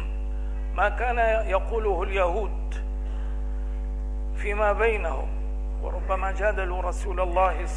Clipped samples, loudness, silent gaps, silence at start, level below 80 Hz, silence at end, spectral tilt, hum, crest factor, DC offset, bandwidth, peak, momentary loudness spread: under 0.1%; -27 LUFS; none; 0 s; -28 dBFS; 0 s; -6.5 dB/octave; 50 Hz at -30 dBFS; 18 dB; 0.3%; 10 kHz; -8 dBFS; 9 LU